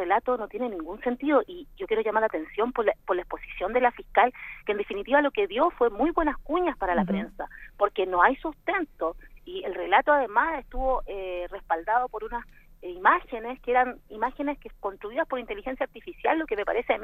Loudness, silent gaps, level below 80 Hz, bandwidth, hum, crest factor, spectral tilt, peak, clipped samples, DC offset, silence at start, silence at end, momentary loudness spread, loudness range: -27 LUFS; none; -46 dBFS; 14.5 kHz; none; 22 dB; -7.5 dB/octave; -4 dBFS; under 0.1%; under 0.1%; 0 s; 0 s; 13 LU; 3 LU